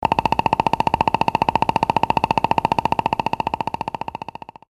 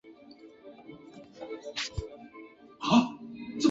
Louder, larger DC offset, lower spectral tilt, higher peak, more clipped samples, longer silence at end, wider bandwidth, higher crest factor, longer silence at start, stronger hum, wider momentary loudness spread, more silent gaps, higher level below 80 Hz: first, -20 LUFS vs -31 LUFS; neither; about the same, -6 dB/octave vs -5 dB/octave; first, -2 dBFS vs -10 dBFS; neither; first, 0.85 s vs 0 s; first, 13 kHz vs 7.8 kHz; about the same, 20 dB vs 22 dB; about the same, 0 s vs 0.05 s; neither; second, 9 LU vs 26 LU; neither; first, -42 dBFS vs -52 dBFS